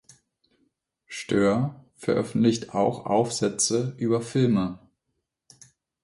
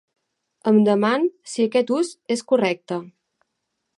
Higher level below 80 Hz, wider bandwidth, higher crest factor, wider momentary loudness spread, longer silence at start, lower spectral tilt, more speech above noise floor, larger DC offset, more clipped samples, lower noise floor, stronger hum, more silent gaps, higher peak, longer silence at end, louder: first, -60 dBFS vs -74 dBFS; about the same, 11.5 kHz vs 11.5 kHz; about the same, 18 dB vs 16 dB; about the same, 10 LU vs 11 LU; first, 1.1 s vs 0.65 s; about the same, -5 dB/octave vs -5.5 dB/octave; about the same, 56 dB vs 57 dB; neither; neither; about the same, -80 dBFS vs -77 dBFS; neither; neither; about the same, -8 dBFS vs -6 dBFS; first, 1.25 s vs 0.95 s; second, -25 LUFS vs -21 LUFS